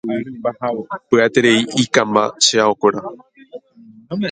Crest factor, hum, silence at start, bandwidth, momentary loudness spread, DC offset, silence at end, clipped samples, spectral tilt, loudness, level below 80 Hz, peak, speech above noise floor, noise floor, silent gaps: 18 dB; none; 0.05 s; 9.6 kHz; 13 LU; under 0.1%; 0 s; under 0.1%; -3.5 dB/octave; -16 LUFS; -60 dBFS; 0 dBFS; 28 dB; -45 dBFS; none